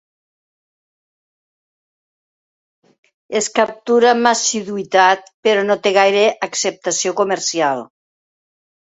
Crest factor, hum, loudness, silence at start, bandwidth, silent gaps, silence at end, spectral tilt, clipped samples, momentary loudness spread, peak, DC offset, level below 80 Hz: 18 dB; none; -16 LUFS; 3.3 s; 8.2 kHz; 5.34-5.43 s; 1 s; -2 dB/octave; under 0.1%; 7 LU; 0 dBFS; under 0.1%; -68 dBFS